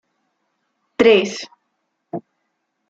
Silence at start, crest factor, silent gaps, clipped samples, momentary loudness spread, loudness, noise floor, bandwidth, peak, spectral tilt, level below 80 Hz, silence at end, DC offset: 1 s; 20 dB; none; under 0.1%; 20 LU; -15 LUFS; -73 dBFS; 7.8 kHz; -2 dBFS; -4 dB/octave; -62 dBFS; 0.7 s; under 0.1%